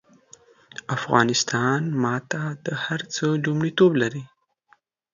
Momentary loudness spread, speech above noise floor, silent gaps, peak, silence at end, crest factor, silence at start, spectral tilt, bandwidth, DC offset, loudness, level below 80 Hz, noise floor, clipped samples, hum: 11 LU; 40 dB; none; -2 dBFS; 0.85 s; 22 dB; 0.9 s; -5 dB/octave; 7.4 kHz; under 0.1%; -23 LUFS; -64 dBFS; -62 dBFS; under 0.1%; none